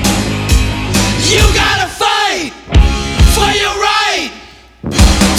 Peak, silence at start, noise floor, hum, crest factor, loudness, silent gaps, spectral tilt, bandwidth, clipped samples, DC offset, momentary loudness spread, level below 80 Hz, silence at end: 0 dBFS; 0 s; -36 dBFS; none; 12 dB; -11 LUFS; none; -3.5 dB/octave; 16 kHz; 0.4%; under 0.1%; 6 LU; -16 dBFS; 0 s